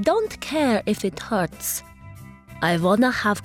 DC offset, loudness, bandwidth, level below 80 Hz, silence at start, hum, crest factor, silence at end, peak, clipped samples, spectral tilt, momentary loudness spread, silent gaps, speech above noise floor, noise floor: under 0.1%; -23 LUFS; 18 kHz; -50 dBFS; 0 s; none; 16 dB; 0 s; -8 dBFS; under 0.1%; -4.5 dB/octave; 14 LU; none; 20 dB; -42 dBFS